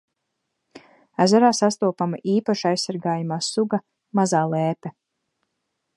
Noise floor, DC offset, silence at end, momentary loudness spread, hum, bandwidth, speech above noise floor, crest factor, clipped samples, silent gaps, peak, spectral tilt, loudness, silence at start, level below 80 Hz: -78 dBFS; under 0.1%; 1.05 s; 11 LU; none; 11.5 kHz; 57 dB; 18 dB; under 0.1%; none; -4 dBFS; -5 dB/octave; -22 LUFS; 0.75 s; -74 dBFS